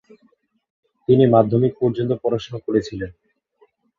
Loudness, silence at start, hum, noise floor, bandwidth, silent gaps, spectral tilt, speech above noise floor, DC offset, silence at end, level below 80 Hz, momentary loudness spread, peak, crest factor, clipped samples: -19 LUFS; 1.1 s; none; -62 dBFS; 7.2 kHz; none; -8.5 dB/octave; 43 dB; under 0.1%; 0.85 s; -52 dBFS; 17 LU; -2 dBFS; 18 dB; under 0.1%